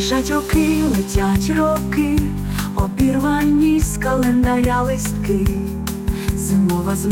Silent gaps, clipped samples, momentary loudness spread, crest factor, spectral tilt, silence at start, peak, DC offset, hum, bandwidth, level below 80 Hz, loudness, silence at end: none; under 0.1%; 6 LU; 12 dB; -6 dB/octave; 0 s; -6 dBFS; under 0.1%; none; 17 kHz; -28 dBFS; -18 LUFS; 0 s